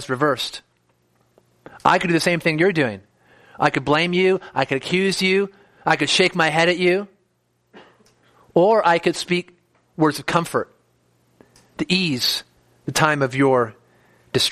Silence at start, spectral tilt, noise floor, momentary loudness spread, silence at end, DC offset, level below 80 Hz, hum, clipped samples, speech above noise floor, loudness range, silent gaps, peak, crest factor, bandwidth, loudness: 0 s; -4.5 dB/octave; -67 dBFS; 11 LU; 0 s; under 0.1%; -58 dBFS; none; under 0.1%; 48 dB; 4 LU; none; 0 dBFS; 20 dB; 15 kHz; -19 LUFS